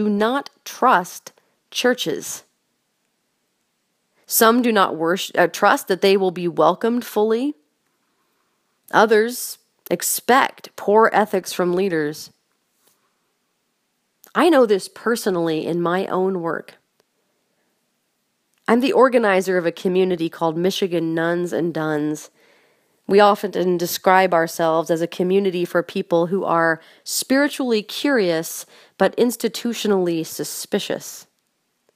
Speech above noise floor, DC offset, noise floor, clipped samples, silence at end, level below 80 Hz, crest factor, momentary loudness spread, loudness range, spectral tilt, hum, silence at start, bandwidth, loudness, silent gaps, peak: 52 dB; under 0.1%; -71 dBFS; under 0.1%; 0.75 s; -74 dBFS; 20 dB; 12 LU; 5 LU; -4 dB/octave; none; 0 s; 15.5 kHz; -19 LUFS; none; 0 dBFS